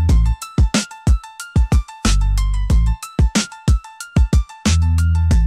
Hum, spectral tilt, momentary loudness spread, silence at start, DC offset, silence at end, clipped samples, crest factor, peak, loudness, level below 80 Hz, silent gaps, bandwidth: none; -5 dB/octave; 4 LU; 0 s; under 0.1%; 0 s; under 0.1%; 10 dB; -6 dBFS; -18 LUFS; -18 dBFS; none; 14 kHz